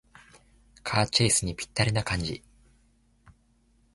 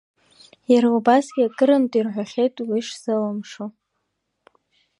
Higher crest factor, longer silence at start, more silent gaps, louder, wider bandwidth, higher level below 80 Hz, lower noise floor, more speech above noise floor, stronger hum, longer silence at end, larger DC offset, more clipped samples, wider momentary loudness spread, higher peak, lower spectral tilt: about the same, 22 dB vs 20 dB; first, 0.85 s vs 0.7 s; neither; second, -26 LUFS vs -20 LUFS; about the same, 11.5 kHz vs 11 kHz; first, -48 dBFS vs -76 dBFS; second, -65 dBFS vs -75 dBFS; second, 38 dB vs 56 dB; neither; first, 1.55 s vs 1.3 s; neither; neither; about the same, 14 LU vs 16 LU; second, -8 dBFS vs -2 dBFS; second, -3.5 dB/octave vs -5.5 dB/octave